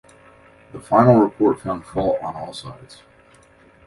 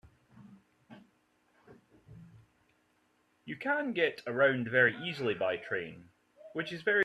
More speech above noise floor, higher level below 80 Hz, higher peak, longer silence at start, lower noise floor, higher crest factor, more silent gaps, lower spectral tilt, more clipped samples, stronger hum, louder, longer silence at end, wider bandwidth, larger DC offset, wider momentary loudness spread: second, 33 dB vs 41 dB; first, -50 dBFS vs -74 dBFS; first, 0 dBFS vs -12 dBFS; first, 0.75 s vs 0.4 s; second, -52 dBFS vs -72 dBFS; about the same, 20 dB vs 22 dB; neither; first, -8 dB/octave vs -6 dB/octave; neither; neither; first, -18 LUFS vs -31 LUFS; first, 1.1 s vs 0 s; about the same, 11.5 kHz vs 12 kHz; neither; first, 24 LU vs 15 LU